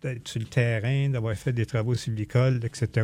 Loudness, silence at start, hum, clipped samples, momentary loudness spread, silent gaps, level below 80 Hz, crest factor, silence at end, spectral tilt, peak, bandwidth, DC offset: -27 LUFS; 0.05 s; none; under 0.1%; 5 LU; none; -54 dBFS; 16 dB; 0 s; -6.5 dB/octave; -10 dBFS; 11.5 kHz; under 0.1%